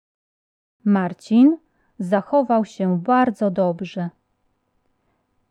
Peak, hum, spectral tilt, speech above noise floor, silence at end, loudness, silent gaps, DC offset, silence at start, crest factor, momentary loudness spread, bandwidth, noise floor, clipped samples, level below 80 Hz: -6 dBFS; none; -8.5 dB/octave; 50 dB; 1.4 s; -20 LUFS; none; under 0.1%; 0.85 s; 16 dB; 14 LU; 9.4 kHz; -69 dBFS; under 0.1%; -68 dBFS